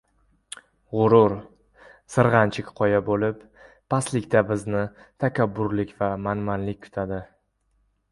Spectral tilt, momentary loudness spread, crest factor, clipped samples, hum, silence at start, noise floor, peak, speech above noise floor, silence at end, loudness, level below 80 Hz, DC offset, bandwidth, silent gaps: -7 dB/octave; 16 LU; 22 dB; under 0.1%; none; 0.9 s; -68 dBFS; -2 dBFS; 46 dB; 0.85 s; -23 LUFS; -52 dBFS; under 0.1%; 11.5 kHz; none